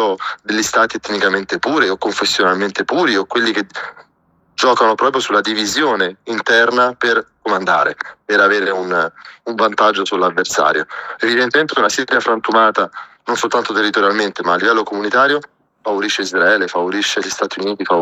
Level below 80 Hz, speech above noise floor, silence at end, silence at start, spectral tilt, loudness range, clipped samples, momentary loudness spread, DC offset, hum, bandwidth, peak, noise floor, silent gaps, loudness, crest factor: -60 dBFS; 42 dB; 0 s; 0 s; -2.5 dB/octave; 2 LU; under 0.1%; 8 LU; under 0.1%; none; 15.5 kHz; -2 dBFS; -58 dBFS; none; -15 LUFS; 14 dB